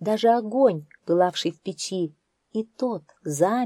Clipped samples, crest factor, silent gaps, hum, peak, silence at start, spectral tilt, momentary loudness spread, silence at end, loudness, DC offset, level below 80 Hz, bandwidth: under 0.1%; 18 dB; none; none; -6 dBFS; 0 s; -5 dB/octave; 12 LU; 0 s; -25 LUFS; under 0.1%; -78 dBFS; 14 kHz